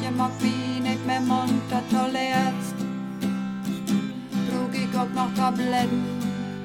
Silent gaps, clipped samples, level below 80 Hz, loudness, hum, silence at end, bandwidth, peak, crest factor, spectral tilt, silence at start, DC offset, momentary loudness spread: none; under 0.1%; -60 dBFS; -26 LUFS; none; 0 s; 16.5 kHz; -10 dBFS; 16 dB; -5.5 dB/octave; 0 s; under 0.1%; 6 LU